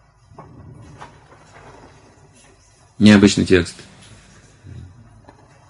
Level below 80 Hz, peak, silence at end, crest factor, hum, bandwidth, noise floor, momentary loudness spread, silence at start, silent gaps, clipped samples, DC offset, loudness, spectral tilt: -42 dBFS; 0 dBFS; 0.9 s; 20 dB; none; 11.5 kHz; -51 dBFS; 30 LU; 3 s; none; under 0.1%; under 0.1%; -14 LUFS; -5.5 dB/octave